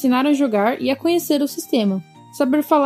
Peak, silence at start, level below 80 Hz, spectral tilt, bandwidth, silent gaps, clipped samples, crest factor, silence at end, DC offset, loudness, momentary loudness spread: -2 dBFS; 0 s; -70 dBFS; -5 dB/octave; 16 kHz; none; under 0.1%; 16 dB; 0 s; under 0.1%; -19 LUFS; 5 LU